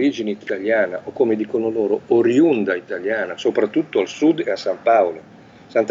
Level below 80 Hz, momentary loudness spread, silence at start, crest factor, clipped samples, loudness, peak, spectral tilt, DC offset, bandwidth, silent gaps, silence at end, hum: -66 dBFS; 8 LU; 0 s; 16 dB; under 0.1%; -19 LUFS; -4 dBFS; -6 dB/octave; under 0.1%; 7.6 kHz; none; 0 s; none